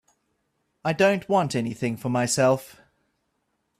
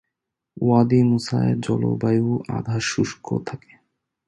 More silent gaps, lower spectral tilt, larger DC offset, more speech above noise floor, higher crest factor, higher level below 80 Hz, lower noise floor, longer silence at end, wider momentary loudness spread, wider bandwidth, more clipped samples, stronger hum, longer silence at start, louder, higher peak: neither; second, -5 dB/octave vs -6.5 dB/octave; neither; second, 51 dB vs 61 dB; about the same, 18 dB vs 18 dB; second, -64 dBFS vs -54 dBFS; second, -74 dBFS vs -82 dBFS; first, 1.1 s vs 0.7 s; second, 8 LU vs 11 LU; first, 15.5 kHz vs 11 kHz; neither; neither; first, 0.85 s vs 0.55 s; second, -24 LUFS vs -21 LUFS; second, -8 dBFS vs -4 dBFS